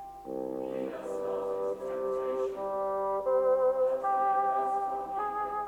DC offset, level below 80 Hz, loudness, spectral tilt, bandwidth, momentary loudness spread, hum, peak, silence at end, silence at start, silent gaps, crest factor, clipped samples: under 0.1%; -64 dBFS; -31 LUFS; -6 dB/octave; 11.5 kHz; 9 LU; none; -18 dBFS; 0 s; 0 s; none; 14 dB; under 0.1%